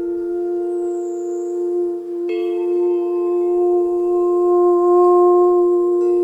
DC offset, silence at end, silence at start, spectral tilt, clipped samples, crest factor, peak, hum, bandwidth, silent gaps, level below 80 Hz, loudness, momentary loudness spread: under 0.1%; 0 s; 0 s; -6.5 dB/octave; under 0.1%; 12 dB; -6 dBFS; none; 7.8 kHz; none; -60 dBFS; -17 LUFS; 11 LU